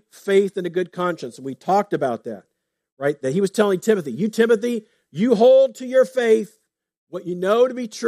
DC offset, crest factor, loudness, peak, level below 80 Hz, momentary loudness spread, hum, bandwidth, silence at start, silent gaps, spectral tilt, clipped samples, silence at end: under 0.1%; 16 dB; -20 LUFS; -4 dBFS; -74 dBFS; 15 LU; none; 14.5 kHz; 0.25 s; 2.92-2.97 s, 6.97-7.07 s; -6 dB/octave; under 0.1%; 0 s